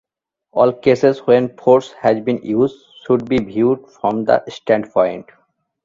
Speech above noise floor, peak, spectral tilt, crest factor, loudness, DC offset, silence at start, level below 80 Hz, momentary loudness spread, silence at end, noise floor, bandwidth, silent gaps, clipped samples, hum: 46 dB; 0 dBFS; -7.5 dB/octave; 16 dB; -17 LUFS; under 0.1%; 0.55 s; -54 dBFS; 6 LU; 0.65 s; -62 dBFS; 7.6 kHz; none; under 0.1%; none